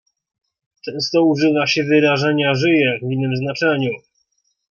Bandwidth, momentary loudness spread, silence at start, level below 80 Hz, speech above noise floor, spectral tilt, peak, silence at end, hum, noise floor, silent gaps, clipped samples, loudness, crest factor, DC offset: 7.2 kHz; 9 LU; 0.85 s; -62 dBFS; 50 dB; -6 dB/octave; -4 dBFS; 0.75 s; none; -67 dBFS; none; under 0.1%; -17 LUFS; 16 dB; under 0.1%